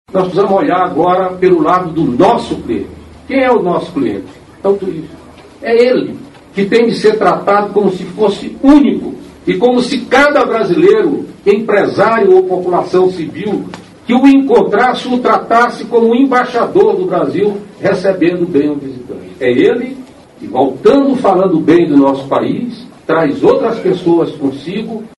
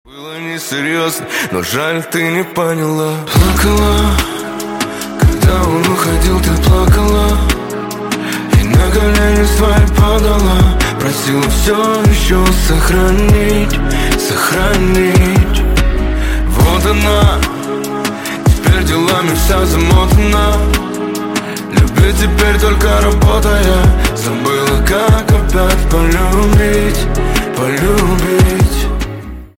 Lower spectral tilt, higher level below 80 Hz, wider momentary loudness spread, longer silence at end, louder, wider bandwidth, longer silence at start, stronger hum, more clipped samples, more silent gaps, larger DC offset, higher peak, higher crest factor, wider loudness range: first, -6.5 dB/octave vs -5 dB/octave; second, -46 dBFS vs -14 dBFS; first, 12 LU vs 8 LU; about the same, 0.1 s vs 0.1 s; about the same, -11 LUFS vs -12 LUFS; second, 11.5 kHz vs 17 kHz; about the same, 0.15 s vs 0.15 s; neither; first, 0.2% vs under 0.1%; neither; neither; about the same, 0 dBFS vs 0 dBFS; about the same, 12 dB vs 10 dB; about the same, 4 LU vs 2 LU